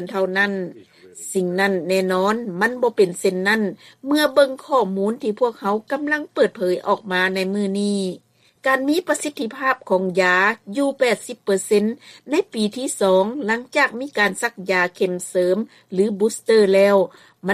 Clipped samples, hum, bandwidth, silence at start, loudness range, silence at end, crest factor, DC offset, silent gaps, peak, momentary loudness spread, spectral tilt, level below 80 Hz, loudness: under 0.1%; none; 15 kHz; 0 s; 2 LU; 0 s; 16 dB; under 0.1%; none; -4 dBFS; 8 LU; -4.5 dB/octave; -68 dBFS; -20 LUFS